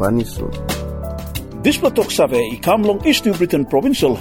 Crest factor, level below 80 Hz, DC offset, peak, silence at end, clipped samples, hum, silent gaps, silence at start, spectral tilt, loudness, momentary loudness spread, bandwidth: 16 dB; -34 dBFS; under 0.1%; -2 dBFS; 0 s; under 0.1%; none; none; 0 s; -5 dB/octave; -17 LUFS; 11 LU; 18 kHz